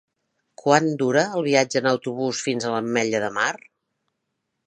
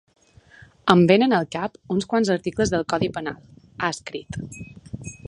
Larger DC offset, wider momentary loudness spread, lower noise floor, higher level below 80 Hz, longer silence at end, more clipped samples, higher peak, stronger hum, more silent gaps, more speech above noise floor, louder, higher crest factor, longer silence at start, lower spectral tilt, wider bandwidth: neither; second, 6 LU vs 21 LU; first, -78 dBFS vs -50 dBFS; second, -70 dBFS vs -50 dBFS; first, 1.1 s vs 0.1 s; neither; about the same, -2 dBFS vs 0 dBFS; neither; neither; first, 56 dB vs 29 dB; about the same, -22 LUFS vs -22 LUFS; about the same, 22 dB vs 22 dB; second, 0.65 s vs 0.85 s; second, -4 dB/octave vs -5.5 dB/octave; about the same, 10.5 kHz vs 11 kHz